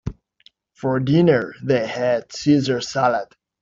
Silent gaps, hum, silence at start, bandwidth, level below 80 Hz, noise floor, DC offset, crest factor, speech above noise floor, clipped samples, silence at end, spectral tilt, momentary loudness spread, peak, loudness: none; none; 0.05 s; 7.6 kHz; -48 dBFS; -56 dBFS; under 0.1%; 16 dB; 37 dB; under 0.1%; 0.4 s; -6.5 dB/octave; 11 LU; -4 dBFS; -20 LUFS